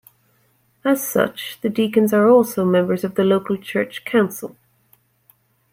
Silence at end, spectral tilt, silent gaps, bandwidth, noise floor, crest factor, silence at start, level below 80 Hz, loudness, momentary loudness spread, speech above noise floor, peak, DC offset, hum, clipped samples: 1.25 s; -5.5 dB/octave; none; 16.5 kHz; -61 dBFS; 16 dB; 0.85 s; -66 dBFS; -19 LUFS; 10 LU; 43 dB; -4 dBFS; under 0.1%; none; under 0.1%